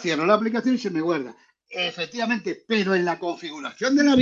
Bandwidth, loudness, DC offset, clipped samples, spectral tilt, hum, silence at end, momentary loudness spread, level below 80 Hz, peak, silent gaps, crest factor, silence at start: 7.6 kHz; -24 LUFS; under 0.1%; under 0.1%; -5 dB/octave; none; 0 s; 11 LU; -66 dBFS; -4 dBFS; none; 18 dB; 0 s